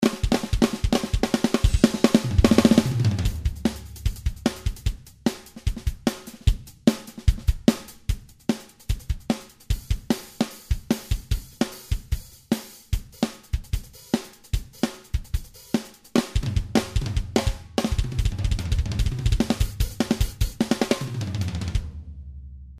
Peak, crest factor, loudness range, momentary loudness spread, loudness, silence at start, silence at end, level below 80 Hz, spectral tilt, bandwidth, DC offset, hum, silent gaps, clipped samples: 0 dBFS; 24 dB; 8 LU; 11 LU; -26 LUFS; 0 s; 0 s; -30 dBFS; -6 dB/octave; 15.5 kHz; under 0.1%; none; none; under 0.1%